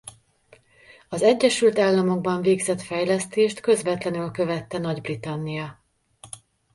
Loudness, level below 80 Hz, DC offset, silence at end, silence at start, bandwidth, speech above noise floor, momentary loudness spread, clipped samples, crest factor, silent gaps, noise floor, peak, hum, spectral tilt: -23 LUFS; -62 dBFS; under 0.1%; 0.4 s; 0.05 s; 11.5 kHz; 34 dB; 18 LU; under 0.1%; 18 dB; none; -57 dBFS; -6 dBFS; none; -5 dB/octave